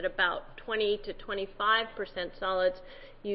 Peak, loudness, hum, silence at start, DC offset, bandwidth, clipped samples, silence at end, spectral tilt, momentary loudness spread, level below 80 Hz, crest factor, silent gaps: -14 dBFS; -31 LUFS; none; 0 s; under 0.1%; 5.8 kHz; under 0.1%; 0 s; -7 dB/octave; 12 LU; -52 dBFS; 18 dB; none